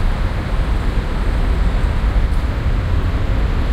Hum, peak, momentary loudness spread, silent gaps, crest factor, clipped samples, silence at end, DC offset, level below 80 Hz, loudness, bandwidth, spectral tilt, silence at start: none; -4 dBFS; 2 LU; none; 12 dB; under 0.1%; 0 s; under 0.1%; -16 dBFS; -20 LUFS; 8.8 kHz; -7 dB/octave; 0 s